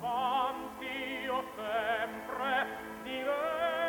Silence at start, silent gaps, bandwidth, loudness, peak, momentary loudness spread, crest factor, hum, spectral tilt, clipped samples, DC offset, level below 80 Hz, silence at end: 0 s; none; 19 kHz; -34 LUFS; -20 dBFS; 7 LU; 14 dB; none; -3.5 dB/octave; under 0.1%; under 0.1%; -66 dBFS; 0 s